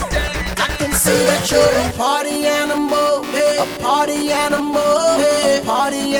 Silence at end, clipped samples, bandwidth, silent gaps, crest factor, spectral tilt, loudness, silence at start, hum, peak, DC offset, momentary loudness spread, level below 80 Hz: 0 s; under 0.1%; over 20 kHz; none; 16 dB; -3 dB/octave; -16 LUFS; 0 s; none; -2 dBFS; under 0.1%; 5 LU; -34 dBFS